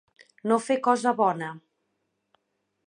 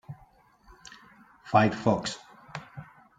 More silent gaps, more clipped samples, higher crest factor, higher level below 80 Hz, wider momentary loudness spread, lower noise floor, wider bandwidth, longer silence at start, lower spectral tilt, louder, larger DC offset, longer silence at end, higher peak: neither; neither; about the same, 20 dB vs 24 dB; second, -82 dBFS vs -62 dBFS; second, 12 LU vs 25 LU; first, -78 dBFS vs -59 dBFS; first, 10.5 kHz vs 9.4 kHz; first, 0.45 s vs 0.1 s; about the same, -5 dB/octave vs -6 dB/octave; about the same, -25 LUFS vs -26 LUFS; neither; first, 1.3 s vs 0.35 s; about the same, -8 dBFS vs -6 dBFS